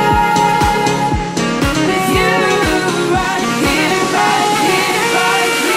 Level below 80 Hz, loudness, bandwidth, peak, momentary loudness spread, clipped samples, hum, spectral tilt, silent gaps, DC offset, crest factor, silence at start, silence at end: -30 dBFS; -13 LUFS; 16 kHz; 0 dBFS; 3 LU; under 0.1%; none; -4 dB/octave; none; under 0.1%; 12 dB; 0 s; 0 s